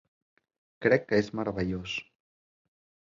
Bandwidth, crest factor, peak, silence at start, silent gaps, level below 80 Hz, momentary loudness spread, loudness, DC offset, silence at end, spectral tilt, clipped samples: 7.6 kHz; 22 dB; -8 dBFS; 0.8 s; none; -56 dBFS; 10 LU; -29 LUFS; under 0.1%; 1.05 s; -6.5 dB/octave; under 0.1%